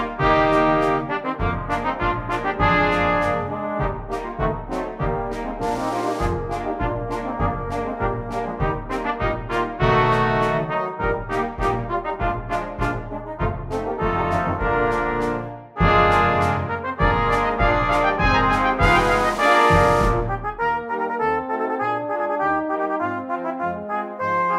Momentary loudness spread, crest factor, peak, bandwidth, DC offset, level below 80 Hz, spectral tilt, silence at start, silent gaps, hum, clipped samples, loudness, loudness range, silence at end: 10 LU; 18 dB; -4 dBFS; 14.5 kHz; under 0.1%; -32 dBFS; -6.5 dB/octave; 0 s; none; none; under 0.1%; -21 LUFS; 7 LU; 0 s